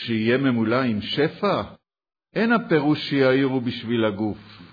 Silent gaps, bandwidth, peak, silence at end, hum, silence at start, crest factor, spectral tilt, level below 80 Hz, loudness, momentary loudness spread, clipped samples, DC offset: none; 5 kHz; -6 dBFS; 0.05 s; none; 0 s; 16 dB; -8 dB/octave; -60 dBFS; -22 LUFS; 9 LU; under 0.1%; under 0.1%